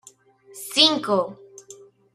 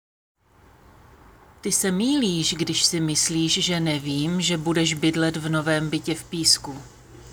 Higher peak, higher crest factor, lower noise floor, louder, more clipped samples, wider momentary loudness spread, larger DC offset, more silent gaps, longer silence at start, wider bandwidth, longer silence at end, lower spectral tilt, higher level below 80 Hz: about the same, -2 dBFS vs -4 dBFS; about the same, 24 dB vs 20 dB; about the same, -52 dBFS vs -54 dBFS; first, -19 LUFS vs -22 LUFS; neither; first, 16 LU vs 6 LU; neither; neither; second, 0.55 s vs 1.65 s; second, 15.5 kHz vs over 20 kHz; first, 0.4 s vs 0 s; about the same, -2.5 dB/octave vs -3.5 dB/octave; second, -72 dBFS vs -54 dBFS